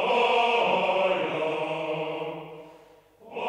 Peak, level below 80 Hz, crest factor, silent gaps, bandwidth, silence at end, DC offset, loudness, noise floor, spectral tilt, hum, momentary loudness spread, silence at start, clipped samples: -12 dBFS; -72 dBFS; 14 dB; none; 10.5 kHz; 0 s; under 0.1%; -25 LUFS; -54 dBFS; -4.5 dB/octave; none; 19 LU; 0 s; under 0.1%